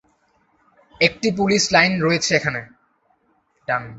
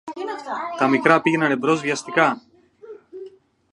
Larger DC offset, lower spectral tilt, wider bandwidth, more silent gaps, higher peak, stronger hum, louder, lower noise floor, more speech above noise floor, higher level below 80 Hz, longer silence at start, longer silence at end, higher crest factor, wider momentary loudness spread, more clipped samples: neither; second, -3.5 dB/octave vs -5 dB/octave; second, 8.2 kHz vs 11 kHz; neither; about the same, -2 dBFS vs 0 dBFS; neither; about the same, -18 LUFS vs -20 LUFS; first, -64 dBFS vs -44 dBFS; first, 45 dB vs 24 dB; first, -54 dBFS vs -70 dBFS; first, 1 s vs 0.05 s; second, 0 s vs 0.45 s; about the same, 20 dB vs 22 dB; second, 10 LU vs 23 LU; neither